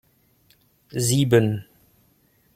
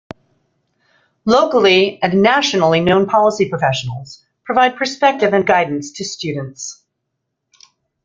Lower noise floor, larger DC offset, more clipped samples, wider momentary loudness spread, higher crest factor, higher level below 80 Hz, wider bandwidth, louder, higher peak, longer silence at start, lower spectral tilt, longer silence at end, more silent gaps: second, -62 dBFS vs -75 dBFS; neither; neither; about the same, 15 LU vs 14 LU; about the same, 20 dB vs 16 dB; about the same, -58 dBFS vs -54 dBFS; first, 16.5 kHz vs 7.8 kHz; second, -21 LUFS vs -15 LUFS; second, -4 dBFS vs 0 dBFS; second, 0.95 s vs 1.25 s; about the same, -5.5 dB/octave vs -4.5 dB/octave; second, 0.95 s vs 1.3 s; neither